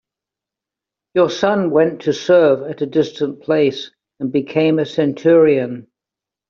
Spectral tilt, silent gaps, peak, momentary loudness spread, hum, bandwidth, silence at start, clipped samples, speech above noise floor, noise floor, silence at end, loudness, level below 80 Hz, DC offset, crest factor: -5.5 dB/octave; none; 0 dBFS; 12 LU; none; 7.2 kHz; 1.15 s; under 0.1%; 71 dB; -86 dBFS; 0.7 s; -16 LUFS; -62 dBFS; under 0.1%; 16 dB